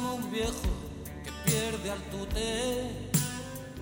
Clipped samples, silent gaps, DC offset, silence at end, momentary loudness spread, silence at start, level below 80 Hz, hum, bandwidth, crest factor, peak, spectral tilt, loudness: under 0.1%; none; under 0.1%; 0 s; 11 LU; 0 s; -42 dBFS; none; 17 kHz; 20 dB; -14 dBFS; -4 dB/octave; -32 LUFS